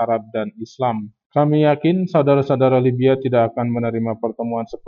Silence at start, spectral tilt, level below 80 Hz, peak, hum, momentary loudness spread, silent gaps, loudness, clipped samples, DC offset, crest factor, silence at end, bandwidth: 0 s; -9.5 dB/octave; -60 dBFS; -4 dBFS; none; 9 LU; 1.26-1.30 s; -18 LUFS; under 0.1%; under 0.1%; 14 dB; 0 s; 6.8 kHz